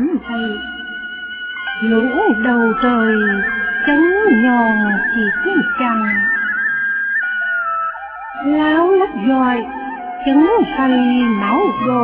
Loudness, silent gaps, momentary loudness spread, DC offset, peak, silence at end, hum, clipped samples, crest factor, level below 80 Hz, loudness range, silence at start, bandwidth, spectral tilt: -15 LUFS; none; 12 LU; under 0.1%; -2 dBFS; 0 s; none; under 0.1%; 14 dB; -48 dBFS; 3 LU; 0 s; 4 kHz; -9 dB/octave